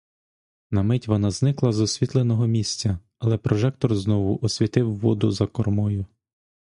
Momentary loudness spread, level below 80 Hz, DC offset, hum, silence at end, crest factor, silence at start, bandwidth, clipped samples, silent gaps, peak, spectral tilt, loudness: 5 LU; -44 dBFS; under 0.1%; none; 0.6 s; 18 dB; 0.7 s; 11 kHz; under 0.1%; none; -4 dBFS; -6.5 dB/octave; -23 LUFS